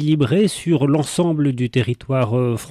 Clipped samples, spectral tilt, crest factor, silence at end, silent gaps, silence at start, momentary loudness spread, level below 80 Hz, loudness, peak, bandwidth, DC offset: under 0.1%; -6.5 dB/octave; 10 dB; 0 s; none; 0 s; 4 LU; -52 dBFS; -18 LUFS; -8 dBFS; 14 kHz; under 0.1%